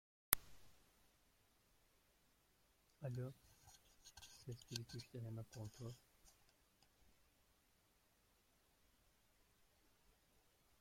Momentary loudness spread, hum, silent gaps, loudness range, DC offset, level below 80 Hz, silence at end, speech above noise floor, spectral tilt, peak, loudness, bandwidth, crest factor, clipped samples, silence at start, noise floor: 26 LU; none; none; 10 LU; under 0.1%; -74 dBFS; 0.7 s; 26 dB; -3.5 dB/octave; -8 dBFS; -48 LUFS; 16.5 kHz; 48 dB; under 0.1%; 0.3 s; -78 dBFS